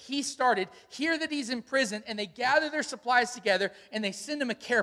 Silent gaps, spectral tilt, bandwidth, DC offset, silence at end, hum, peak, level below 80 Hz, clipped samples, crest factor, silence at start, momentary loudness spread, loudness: none; -2.5 dB/octave; 14.5 kHz; under 0.1%; 0 s; none; -10 dBFS; -74 dBFS; under 0.1%; 20 dB; 0 s; 7 LU; -29 LUFS